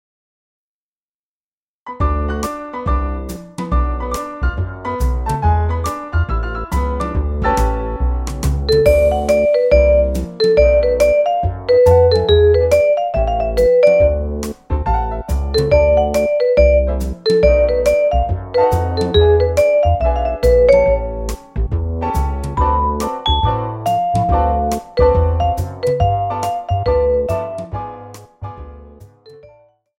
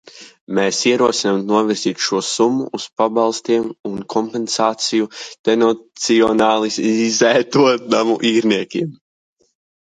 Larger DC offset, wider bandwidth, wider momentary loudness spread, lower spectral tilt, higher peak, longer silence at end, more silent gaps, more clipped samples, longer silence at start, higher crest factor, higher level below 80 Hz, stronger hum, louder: neither; first, 16.5 kHz vs 9.6 kHz; about the same, 11 LU vs 9 LU; first, -6.5 dB/octave vs -3.5 dB/octave; about the same, 0 dBFS vs 0 dBFS; second, 0.65 s vs 1 s; second, none vs 0.41-0.47 s, 3.80-3.84 s, 5.39-5.44 s; neither; first, 1.85 s vs 0.15 s; about the same, 16 dB vs 16 dB; first, -22 dBFS vs -60 dBFS; neither; about the same, -16 LUFS vs -17 LUFS